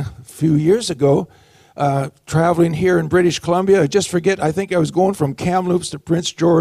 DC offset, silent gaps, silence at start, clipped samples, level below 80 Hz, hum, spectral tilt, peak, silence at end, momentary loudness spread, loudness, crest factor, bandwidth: under 0.1%; none; 0 s; under 0.1%; -48 dBFS; none; -6 dB/octave; -4 dBFS; 0 s; 6 LU; -17 LUFS; 14 dB; 14.5 kHz